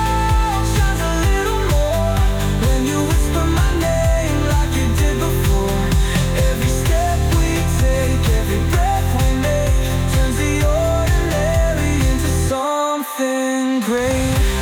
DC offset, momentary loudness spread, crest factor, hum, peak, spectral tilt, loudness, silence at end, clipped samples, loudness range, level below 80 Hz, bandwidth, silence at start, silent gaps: under 0.1%; 1 LU; 10 dB; none; -6 dBFS; -5.5 dB/octave; -18 LUFS; 0 s; under 0.1%; 1 LU; -20 dBFS; 19.5 kHz; 0 s; none